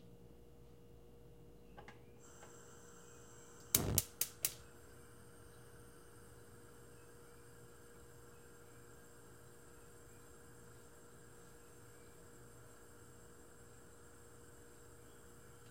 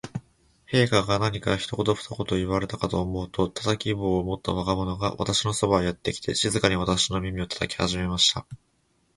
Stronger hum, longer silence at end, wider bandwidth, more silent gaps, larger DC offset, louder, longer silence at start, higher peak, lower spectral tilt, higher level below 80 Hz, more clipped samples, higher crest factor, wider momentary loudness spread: neither; second, 0 s vs 0.6 s; first, 16.5 kHz vs 11.5 kHz; neither; neither; second, -38 LUFS vs -25 LUFS; about the same, 0 s vs 0.05 s; second, -8 dBFS vs -4 dBFS; second, -2.5 dB/octave vs -4.5 dB/octave; second, -66 dBFS vs -44 dBFS; neither; first, 42 dB vs 22 dB; first, 20 LU vs 8 LU